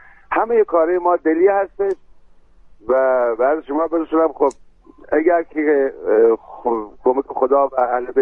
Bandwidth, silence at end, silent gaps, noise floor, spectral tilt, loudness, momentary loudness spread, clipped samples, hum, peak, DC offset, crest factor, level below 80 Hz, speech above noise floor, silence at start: 8.4 kHz; 0 s; none; -46 dBFS; -7 dB/octave; -18 LUFS; 7 LU; under 0.1%; none; -2 dBFS; under 0.1%; 14 dB; -52 dBFS; 29 dB; 0.3 s